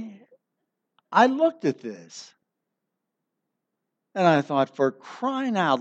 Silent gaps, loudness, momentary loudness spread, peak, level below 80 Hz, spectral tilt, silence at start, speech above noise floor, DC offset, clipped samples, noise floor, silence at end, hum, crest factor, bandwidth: none; -23 LUFS; 20 LU; -4 dBFS; -82 dBFS; -6 dB/octave; 0 s; 59 dB; under 0.1%; under 0.1%; -82 dBFS; 0 s; none; 22 dB; 8.2 kHz